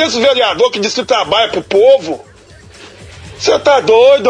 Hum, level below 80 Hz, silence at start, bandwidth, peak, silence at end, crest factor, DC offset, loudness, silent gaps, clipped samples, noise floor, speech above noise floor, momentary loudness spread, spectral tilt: none; -48 dBFS; 0 s; 10 kHz; 0 dBFS; 0 s; 12 dB; under 0.1%; -11 LUFS; none; under 0.1%; -39 dBFS; 28 dB; 8 LU; -3 dB/octave